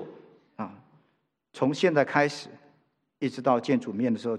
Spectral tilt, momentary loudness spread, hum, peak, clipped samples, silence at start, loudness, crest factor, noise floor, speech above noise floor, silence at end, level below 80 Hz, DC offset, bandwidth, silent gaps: -6 dB/octave; 17 LU; none; -6 dBFS; under 0.1%; 0 s; -26 LUFS; 22 dB; -73 dBFS; 48 dB; 0 s; -80 dBFS; under 0.1%; 10.5 kHz; none